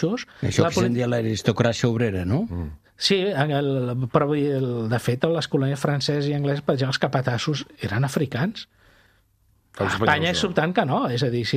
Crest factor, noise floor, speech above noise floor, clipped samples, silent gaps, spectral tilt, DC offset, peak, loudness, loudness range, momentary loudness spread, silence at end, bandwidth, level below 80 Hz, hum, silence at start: 20 dB; -63 dBFS; 40 dB; under 0.1%; none; -5.5 dB/octave; under 0.1%; -2 dBFS; -23 LUFS; 3 LU; 7 LU; 0 s; 14.5 kHz; -50 dBFS; none; 0 s